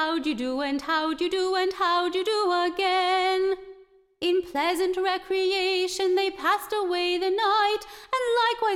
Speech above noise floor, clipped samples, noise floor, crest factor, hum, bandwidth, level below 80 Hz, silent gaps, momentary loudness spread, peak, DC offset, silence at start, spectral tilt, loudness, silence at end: 28 dB; under 0.1%; -53 dBFS; 14 dB; none; 16 kHz; -60 dBFS; none; 5 LU; -12 dBFS; under 0.1%; 0 s; -2 dB/octave; -25 LUFS; 0 s